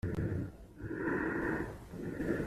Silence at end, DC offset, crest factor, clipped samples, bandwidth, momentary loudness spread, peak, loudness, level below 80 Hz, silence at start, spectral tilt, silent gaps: 0 s; under 0.1%; 16 dB; under 0.1%; 14 kHz; 10 LU; -22 dBFS; -38 LUFS; -52 dBFS; 0.05 s; -8.5 dB/octave; none